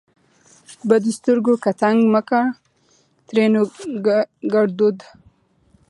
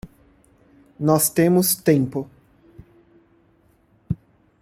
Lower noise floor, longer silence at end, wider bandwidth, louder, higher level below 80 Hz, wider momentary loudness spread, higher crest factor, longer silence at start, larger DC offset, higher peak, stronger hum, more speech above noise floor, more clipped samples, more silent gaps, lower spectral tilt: about the same, -59 dBFS vs -59 dBFS; first, 0.85 s vs 0.45 s; second, 11.5 kHz vs 16.5 kHz; about the same, -18 LUFS vs -20 LUFS; second, -68 dBFS vs -54 dBFS; second, 7 LU vs 14 LU; about the same, 18 dB vs 20 dB; first, 0.7 s vs 0.05 s; neither; about the same, -2 dBFS vs -4 dBFS; neither; about the same, 42 dB vs 41 dB; neither; neither; first, -6.5 dB/octave vs -5 dB/octave